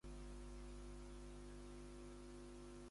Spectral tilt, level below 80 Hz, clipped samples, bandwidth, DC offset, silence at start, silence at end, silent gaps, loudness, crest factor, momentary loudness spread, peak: -5.5 dB/octave; -58 dBFS; under 0.1%; 11.5 kHz; under 0.1%; 0.05 s; 0 s; none; -57 LUFS; 10 dB; 1 LU; -44 dBFS